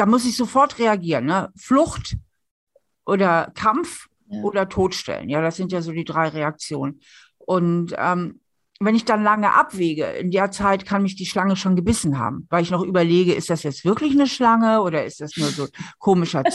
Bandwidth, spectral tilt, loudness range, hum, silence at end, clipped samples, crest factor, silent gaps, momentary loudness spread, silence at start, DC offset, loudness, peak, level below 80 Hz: 12.5 kHz; -5.5 dB/octave; 5 LU; none; 0 s; under 0.1%; 16 dB; 2.51-2.67 s; 10 LU; 0 s; under 0.1%; -20 LUFS; -4 dBFS; -48 dBFS